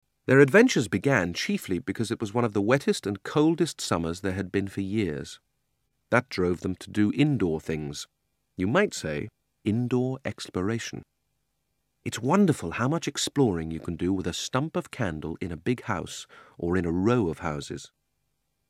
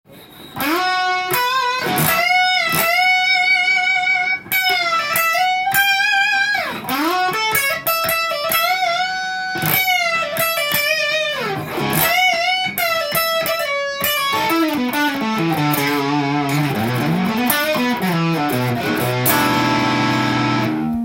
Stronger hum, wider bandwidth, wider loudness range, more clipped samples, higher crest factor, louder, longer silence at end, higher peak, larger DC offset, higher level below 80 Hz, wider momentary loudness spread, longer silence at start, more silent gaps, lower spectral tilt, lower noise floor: neither; about the same, 15.5 kHz vs 17 kHz; about the same, 4 LU vs 3 LU; neither; first, 22 dB vs 16 dB; second, -27 LUFS vs -16 LUFS; first, 0.85 s vs 0 s; second, -4 dBFS vs 0 dBFS; neither; about the same, -54 dBFS vs -54 dBFS; first, 12 LU vs 6 LU; first, 0.3 s vs 0.1 s; neither; first, -5.5 dB/octave vs -3.5 dB/octave; first, -77 dBFS vs -40 dBFS